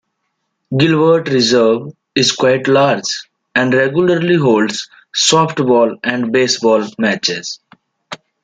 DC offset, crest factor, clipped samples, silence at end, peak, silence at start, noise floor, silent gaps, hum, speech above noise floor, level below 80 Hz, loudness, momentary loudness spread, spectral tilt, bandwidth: under 0.1%; 14 dB; under 0.1%; 0.3 s; 0 dBFS; 0.7 s; -70 dBFS; none; none; 57 dB; -56 dBFS; -13 LUFS; 11 LU; -4 dB/octave; 9.4 kHz